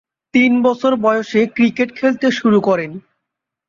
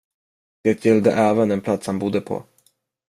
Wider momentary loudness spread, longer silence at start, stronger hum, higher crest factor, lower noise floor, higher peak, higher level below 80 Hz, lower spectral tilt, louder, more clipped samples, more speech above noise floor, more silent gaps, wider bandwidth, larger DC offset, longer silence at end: second, 5 LU vs 9 LU; second, 0.35 s vs 0.65 s; neither; about the same, 14 dB vs 18 dB; first, -80 dBFS vs -63 dBFS; about the same, -2 dBFS vs -4 dBFS; about the same, -60 dBFS vs -62 dBFS; about the same, -6 dB/octave vs -7 dB/octave; first, -15 LUFS vs -20 LUFS; neither; first, 65 dB vs 44 dB; neither; second, 7.4 kHz vs 13 kHz; neither; about the same, 0.7 s vs 0.65 s